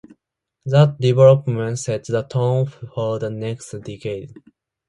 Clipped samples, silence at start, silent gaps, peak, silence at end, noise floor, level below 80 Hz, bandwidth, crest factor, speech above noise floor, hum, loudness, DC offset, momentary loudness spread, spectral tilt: under 0.1%; 0.65 s; none; 0 dBFS; 0.55 s; -78 dBFS; -56 dBFS; 11 kHz; 18 dB; 59 dB; none; -19 LUFS; under 0.1%; 17 LU; -7 dB/octave